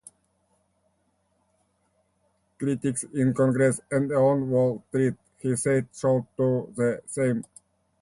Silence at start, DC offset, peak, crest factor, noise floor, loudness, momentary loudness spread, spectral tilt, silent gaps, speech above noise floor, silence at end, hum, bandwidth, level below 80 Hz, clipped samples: 2.6 s; under 0.1%; -10 dBFS; 16 dB; -71 dBFS; -25 LUFS; 7 LU; -7 dB/octave; none; 46 dB; 0.6 s; none; 11.5 kHz; -62 dBFS; under 0.1%